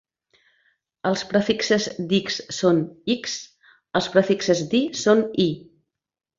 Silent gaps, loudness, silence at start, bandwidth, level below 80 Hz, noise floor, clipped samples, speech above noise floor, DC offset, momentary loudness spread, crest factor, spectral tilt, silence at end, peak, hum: none; -22 LUFS; 1.05 s; 7.8 kHz; -62 dBFS; -68 dBFS; under 0.1%; 46 dB; under 0.1%; 8 LU; 20 dB; -4.5 dB/octave; 0.8 s; -2 dBFS; none